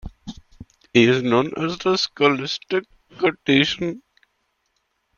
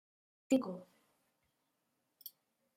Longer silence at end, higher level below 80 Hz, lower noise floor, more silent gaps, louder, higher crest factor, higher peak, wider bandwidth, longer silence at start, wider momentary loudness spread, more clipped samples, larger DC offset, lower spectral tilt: first, 1.2 s vs 0.5 s; first, -50 dBFS vs -82 dBFS; second, -71 dBFS vs -83 dBFS; neither; first, -20 LUFS vs -36 LUFS; about the same, 20 dB vs 22 dB; first, -2 dBFS vs -20 dBFS; second, 7.2 kHz vs 16 kHz; second, 0.05 s vs 0.5 s; about the same, 17 LU vs 19 LU; neither; neither; about the same, -5 dB/octave vs -5.5 dB/octave